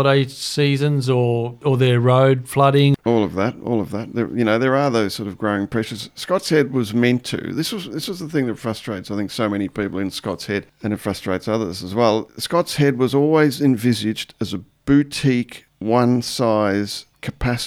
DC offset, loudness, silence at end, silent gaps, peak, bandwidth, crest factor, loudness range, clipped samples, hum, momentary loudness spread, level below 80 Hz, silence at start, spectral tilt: under 0.1%; -20 LUFS; 0 s; none; -2 dBFS; 16 kHz; 18 dB; 7 LU; under 0.1%; none; 10 LU; -48 dBFS; 0 s; -6 dB/octave